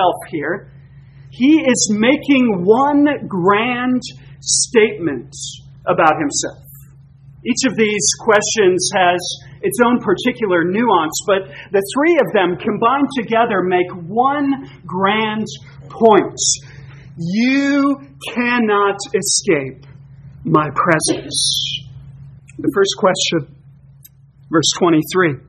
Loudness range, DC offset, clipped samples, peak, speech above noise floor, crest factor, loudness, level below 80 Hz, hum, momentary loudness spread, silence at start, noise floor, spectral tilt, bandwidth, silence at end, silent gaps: 3 LU; under 0.1%; under 0.1%; 0 dBFS; 29 dB; 16 dB; -16 LUFS; -52 dBFS; none; 11 LU; 0 s; -45 dBFS; -3.5 dB/octave; 13 kHz; 0.1 s; none